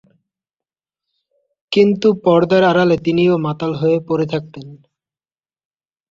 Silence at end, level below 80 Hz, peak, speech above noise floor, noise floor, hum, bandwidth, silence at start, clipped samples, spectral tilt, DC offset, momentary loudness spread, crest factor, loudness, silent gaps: 1.35 s; -56 dBFS; -2 dBFS; over 75 dB; under -90 dBFS; none; 7.6 kHz; 1.7 s; under 0.1%; -7.5 dB/octave; under 0.1%; 9 LU; 16 dB; -15 LUFS; none